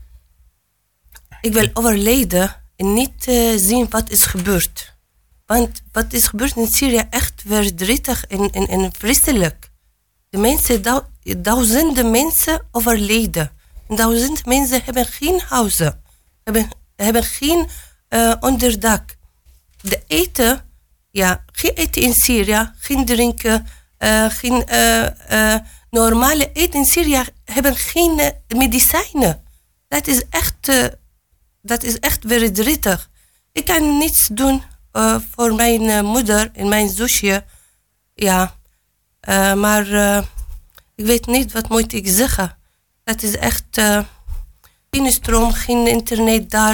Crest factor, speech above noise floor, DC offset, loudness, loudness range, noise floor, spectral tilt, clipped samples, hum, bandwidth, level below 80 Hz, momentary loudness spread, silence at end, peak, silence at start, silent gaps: 16 dB; 50 dB; under 0.1%; -16 LUFS; 3 LU; -66 dBFS; -3 dB/octave; under 0.1%; none; 19.5 kHz; -30 dBFS; 9 LU; 0 s; 0 dBFS; 0 s; none